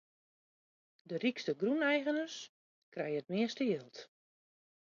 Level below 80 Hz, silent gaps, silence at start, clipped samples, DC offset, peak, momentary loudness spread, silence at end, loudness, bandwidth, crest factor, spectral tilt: -88 dBFS; 2.49-2.92 s; 1.1 s; under 0.1%; under 0.1%; -20 dBFS; 18 LU; 0.85 s; -36 LUFS; 7.2 kHz; 18 dB; -3.5 dB/octave